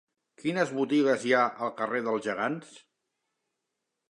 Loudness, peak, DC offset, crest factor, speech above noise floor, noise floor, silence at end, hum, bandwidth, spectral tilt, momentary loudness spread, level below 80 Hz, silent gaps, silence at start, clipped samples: -28 LUFS; -10 dBFS; under 0.1%; 20 dB; 56 dB; -84 dBFS; 1.3 s; none; 11 kHz; -5 dB/octave; 8 LU; -82 dBFS; none; 0.4 s; under 0.1%